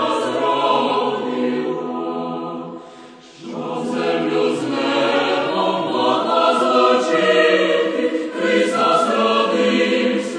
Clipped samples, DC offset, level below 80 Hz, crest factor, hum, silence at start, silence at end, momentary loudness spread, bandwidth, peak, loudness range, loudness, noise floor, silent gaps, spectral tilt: under 0.1%; under 0.1%; -72 dBFS; 16 dB; none; 0 s; 0 s; 11 LU; 10.5 kHz; -2 dBFS; 7 LU; -18 LUFS; -41 dBFS; none; -4.5 dB/octave